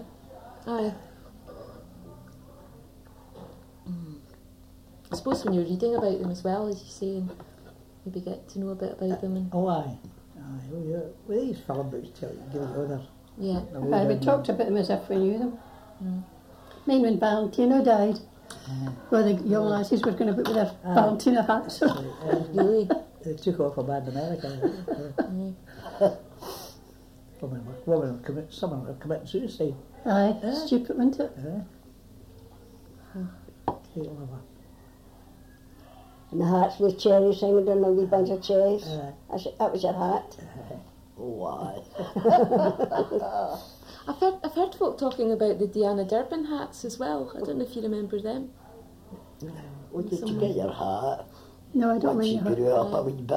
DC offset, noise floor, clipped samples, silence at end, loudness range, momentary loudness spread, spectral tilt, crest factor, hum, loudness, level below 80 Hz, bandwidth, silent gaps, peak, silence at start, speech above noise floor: under 0.1%; -51 dBFS; under 0.1%; 0 s; 11 LU; 20 LU; -7 dB/octave; 20 dB; none; -27 LUFS; -56 dBFS; 16 kHz; none; -8 dBFS; 0 s; 25 dB